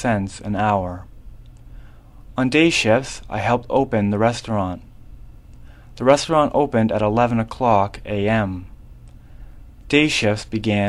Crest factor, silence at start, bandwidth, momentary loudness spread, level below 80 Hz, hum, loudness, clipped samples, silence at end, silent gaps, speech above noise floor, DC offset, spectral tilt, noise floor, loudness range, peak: 20 dB; 0 s; 12.5 kHz; 11 LU; -42 dBFS; none; -19 LUFS; under 0.1%; 0 s; none; 23 dB; under 0.1%; -5.5 dB/octave; -41 dBFS; 2 LU; 0 dBFS